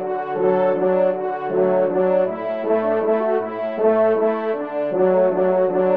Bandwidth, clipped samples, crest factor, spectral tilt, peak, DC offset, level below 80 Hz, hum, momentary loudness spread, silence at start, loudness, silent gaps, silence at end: 4.5 kHz; under 0.1%; 12 dB; -10 dB/octave; -6 dBFS; 0.2%; -70 dBFS; none; 6 LU; 0 s; -19 LUFS; none; 0 s